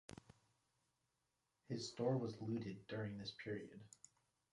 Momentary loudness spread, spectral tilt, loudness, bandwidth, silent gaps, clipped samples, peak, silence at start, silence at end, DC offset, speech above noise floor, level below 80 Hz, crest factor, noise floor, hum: 21 LU; -6 dB/octave; -46 LUFS; 11 kHz; none; under 0.1%; -28 dBFS; 1.7 s; 0.65 s; under 0.1%; 42 dB; -78 dBFS; 20 dB; -88 dBFS; none